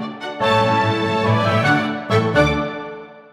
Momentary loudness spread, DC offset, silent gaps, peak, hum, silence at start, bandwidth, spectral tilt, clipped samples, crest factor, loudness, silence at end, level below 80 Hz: 12 LU; under 0.1%; none; -4 dBFS; none; 0 s; 12.5 kHz; -6 dB/octave; under 0.1%; 14 dB; -18 LUFS; 0.1 s; -40 dBFS